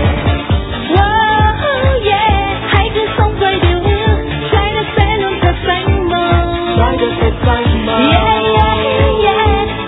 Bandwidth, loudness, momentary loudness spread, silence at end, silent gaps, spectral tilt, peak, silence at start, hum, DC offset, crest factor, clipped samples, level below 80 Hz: 4 kHz; -12 LUFS; 4 LU; 0 s; none; -9.5 dB/octave; 0 dBFS; 0 s; none; under 0.1%; 12 dB; under 0.1%; -20 dBFS